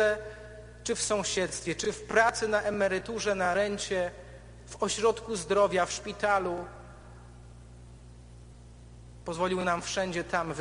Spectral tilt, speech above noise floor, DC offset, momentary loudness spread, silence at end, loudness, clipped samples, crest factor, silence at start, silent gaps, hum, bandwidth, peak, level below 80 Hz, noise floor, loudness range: -3.5 dB/octave; 21 dB; under 0.1%; 21 LU; 0 s; -29 LUFS; under 0.1%; 20 dB; 0 s; none; none; 10 kHz; -10 dBFS; -52 dBFS; -50 dBFS; 8 LU